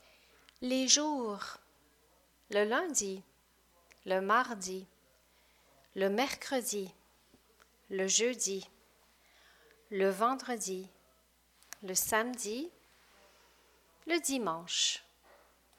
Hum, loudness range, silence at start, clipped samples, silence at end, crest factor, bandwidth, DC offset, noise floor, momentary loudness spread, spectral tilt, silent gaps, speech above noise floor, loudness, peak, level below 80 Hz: 60 Hz at -70 dBFS; 5 LU; 0.6 s; under 0.1%; 0.75 s; 26 dB; 18.5 kHz; under 0.1%; -69 dBFS; 18 LU; -1.5 dB/octave; none; 36 dB; -33 LUFS; -10 dBFS; -74 dBFS